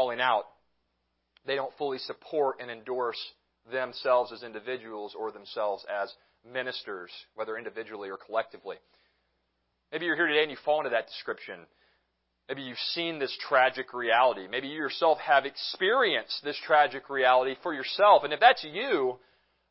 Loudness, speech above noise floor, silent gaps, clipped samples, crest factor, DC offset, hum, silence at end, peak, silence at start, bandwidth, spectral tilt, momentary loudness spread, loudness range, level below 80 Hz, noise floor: -28 LUFS; 49 dB; none; under 0.1%; 24 dB; under 0.1%; none; 0.55 s; -4 dBFS; 0 s; 5.8 kHz; -7 dB/octave; 16 LU; 12 LU; -80 dBFS; -78 dBFS